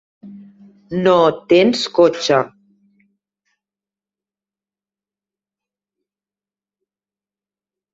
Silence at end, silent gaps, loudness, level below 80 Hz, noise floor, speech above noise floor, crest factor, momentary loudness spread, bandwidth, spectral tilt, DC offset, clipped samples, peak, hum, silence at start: 5.45 s; none; -15 LUFS; -60 dBFS; under -90 dBFS; over 76 dB; 20 dB; 7 LU; 8 kHz; -5 dB/octave; under 0.1%; under 0.1%; -2 dBFS; 50 Hz at -60 dBFS; 0.25 s